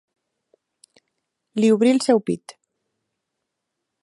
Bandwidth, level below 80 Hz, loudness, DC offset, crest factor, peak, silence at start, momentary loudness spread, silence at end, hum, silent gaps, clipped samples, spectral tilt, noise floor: 11.5 kHz; -74 dBFS; -19 LUFS; under 0.1%; 20 dB; -4 dBFS; 1.55 s; 13 LU; 1.5 s; none; none; under 0.1%; -5.5 dB/octave; -80 dBFS